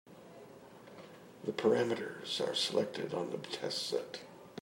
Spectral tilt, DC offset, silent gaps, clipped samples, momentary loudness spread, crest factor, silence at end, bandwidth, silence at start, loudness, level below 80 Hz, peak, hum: -4 dB/octave; under 0.1%; none; under 0.1%; 22 LU; 20 dB; 0 s; 16 kHz; 0.05 s; -35 LUFS; -82 dBFS; -16 dBFS; none